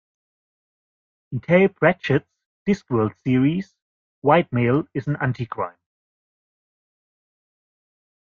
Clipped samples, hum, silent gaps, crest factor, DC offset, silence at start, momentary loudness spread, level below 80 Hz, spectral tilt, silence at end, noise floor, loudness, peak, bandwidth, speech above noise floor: under 0.1%; none; 2.46-2.66 s, 3.82-4.22 s; 22 dB; under 0.1%; 1.3 s; 12 LU; -58 dBFS; -8.5 dB/octave; 2.6 s; under -90 dBFS; -21 LUFS; -2 dBFS; 7.2 kHz; over 70 dB